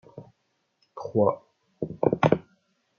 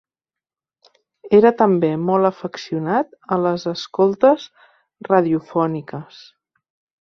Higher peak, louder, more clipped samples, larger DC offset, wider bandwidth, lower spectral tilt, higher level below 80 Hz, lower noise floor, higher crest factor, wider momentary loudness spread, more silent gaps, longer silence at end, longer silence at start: about the same, -4 dBFS vs -2 dBFS; second, -26 LUFS vs -18 LUFS; neither; neither; about the same, 6.8 kHz vs 6.6 kHz; about the same, -8.5 dB/octave vs -7.5 dB/octave; about the same, -62 dBFS vs -64 dBFS; second, -74 dBFS vs -89 dBFS; first, 24 dB vs 18 dB; about the same, 17 LU vs 15 LU; neither; second, 0.6 s vs 0.95 s; second, 0.15 s vs 1.25 s